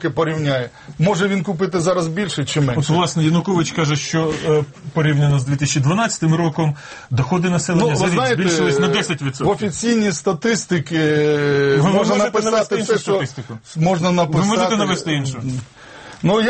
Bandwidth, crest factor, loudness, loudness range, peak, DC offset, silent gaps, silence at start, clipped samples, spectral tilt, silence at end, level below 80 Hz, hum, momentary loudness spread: 8.8 kHz; 12 dB; -18 LUFS; 2 LU; -4 dBFS; under 0.1%; none; 0 s; under 0.1%; -5.5 dB/octave; 0 s; -50 dBFS; none; 6 LU